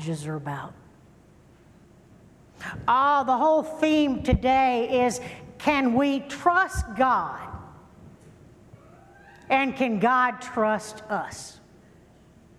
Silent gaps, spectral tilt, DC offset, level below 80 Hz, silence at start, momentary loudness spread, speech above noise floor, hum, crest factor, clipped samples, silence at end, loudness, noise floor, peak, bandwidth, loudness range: none; -5.5 dB/octave; under 0.1%; -44 dBFS; 0 s; 17 LU; 30 dB; none; 18 dB; under 0.1%; 1.05 s; -24 LUFS; -54 dBFS; -6 dBFS; 14 kHz; 5 LU